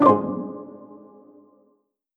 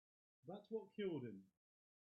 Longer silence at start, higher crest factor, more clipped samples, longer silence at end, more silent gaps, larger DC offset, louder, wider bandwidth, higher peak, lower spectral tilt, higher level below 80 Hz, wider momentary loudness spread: second, 0 s vs 0.45 s; about the same, 22 dB vs 18 dB; neither; first, 1.2 s vs 0.7 s; neither; neither; first, -23 LUFS vs -50 LUFS; about the same, 5.8 kHz vs 5.4 kHz; first, -2 dBFS vs -34 dBFS; first, -9.5 dB/octave vs -6 dB/octave; first, -68 dBFS vs under -90 dBFS; first, 26 LU vs 14 LU